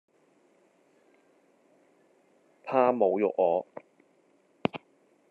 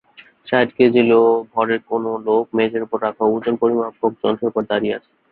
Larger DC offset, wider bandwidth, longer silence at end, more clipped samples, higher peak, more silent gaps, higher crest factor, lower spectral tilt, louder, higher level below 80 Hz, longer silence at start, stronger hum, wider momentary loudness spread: neither; first, 5.4 kHz vs 4.5 kHz; first, 0.55 s vs 0.35 s; neither; second, -8 dBFS vs -2 dBFS; neither; first, 24 dB vs 16 dB; second, -8 dB/octave vs -10 dB/octave; second, -27 LUFS vs -18 LUFS; second, -82 dBFS vs -60 dBFS; first, 2.65 s vs 0.45 s; neither; first, 22 LU vs 8 LU